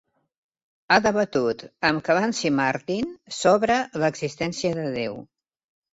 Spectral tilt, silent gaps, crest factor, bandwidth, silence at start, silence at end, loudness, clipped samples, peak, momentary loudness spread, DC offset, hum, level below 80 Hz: -4.5 dB/octave; none; 22 dB; 8 kHz; 0.9 s; 0.7 s; -23 LUFS; under 0.1%; -2 dBFS; 9 LU; under 0.1%; none; -58 dBFS